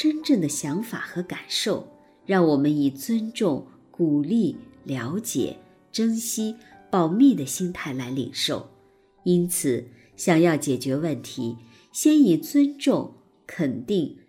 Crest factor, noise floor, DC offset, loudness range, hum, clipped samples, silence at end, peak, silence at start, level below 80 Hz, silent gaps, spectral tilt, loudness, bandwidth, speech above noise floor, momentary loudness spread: 18 dB; -58 dBFS; under 0.1%; 4 LU; none; under 0.1%; 0.15 s; -6 dBFS; 0 s; -64 dBFS; none; -5 dB/octave; -24 LUFS; 17 kHz; 35 dB; 13 LU